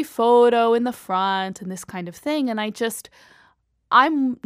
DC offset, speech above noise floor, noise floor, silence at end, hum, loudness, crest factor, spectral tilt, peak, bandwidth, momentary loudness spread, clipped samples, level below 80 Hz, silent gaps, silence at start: under 0.1%; 39 dB; -60 dBFS; 0.1 s; none; -20 LUFS; 18 dB; -4.5 dB/octave; -2 dBFS; 15.5 kHz; 16 LU; under 0.1%; -68 dBFS; none; 0 s